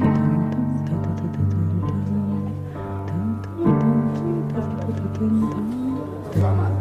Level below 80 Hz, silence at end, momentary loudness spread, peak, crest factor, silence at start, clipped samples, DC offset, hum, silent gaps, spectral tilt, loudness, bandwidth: -46 dBFS; 0 s; 8 LU; -8 dBFS; 14 dB; 0 s; under 0.1%; under 0.1%; none; none; -10 dB/octave; -23 LUFS; 7 kHz